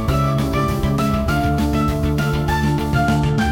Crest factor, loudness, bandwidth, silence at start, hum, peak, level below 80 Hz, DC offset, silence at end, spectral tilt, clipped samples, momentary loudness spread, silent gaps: 12 dB; -19 LUFS; 17 kHz; 0 s; none; -6 dBFS; -26 dBFS; under 0.1%; 0 s; -6.5 dB/octave; under 0.1%; 2 LU; none